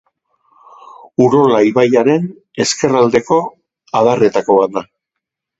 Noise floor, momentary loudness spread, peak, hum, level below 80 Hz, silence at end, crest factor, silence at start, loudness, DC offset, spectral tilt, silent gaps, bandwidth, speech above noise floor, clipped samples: -79 dBFS; 10 LU; 0 dBFS; none; -56 dBFS; 0.75 s; 14 dB; 1.2 s; -13 LUFS; under 0.1%; -5 dB/octave; none; 8.2 kHz; 67 dB; under 0.1%